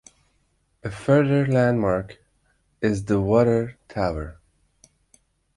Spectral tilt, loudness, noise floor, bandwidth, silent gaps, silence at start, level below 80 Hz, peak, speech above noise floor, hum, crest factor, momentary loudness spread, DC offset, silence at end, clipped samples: -8 dB/octave; -22 LUFS; -67 dBFS; 11.5 kHz; none; 0.85 s; -46 dBFS; -6 dBFS; 46 dB; none; 18 dB; 16 LU; under 0.1%; 1.25 s; under 0.1%